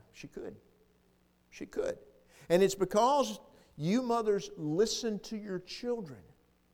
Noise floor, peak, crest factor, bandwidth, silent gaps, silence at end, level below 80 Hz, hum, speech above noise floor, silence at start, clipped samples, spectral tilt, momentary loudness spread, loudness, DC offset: -69 dBFS; -12 dBFS; 22 dB; 19 kHz; none; 0.5 s; -64 dBFS; none; 37 dB; 0.15 s; under 0.1%; -5 dB/octave; 19 LU; -32 LUFS; under 0.1%